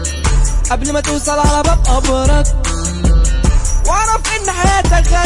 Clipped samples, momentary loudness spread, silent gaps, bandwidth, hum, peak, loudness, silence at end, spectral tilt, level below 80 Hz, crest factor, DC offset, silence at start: under 0.1%; 4 LU; none; 11.5 kHz; none; -2 dBFS; -14 LUFS; 0 s; -4 dB/octave; -14 dBFS; 10 dB; under 0.1%; 0 s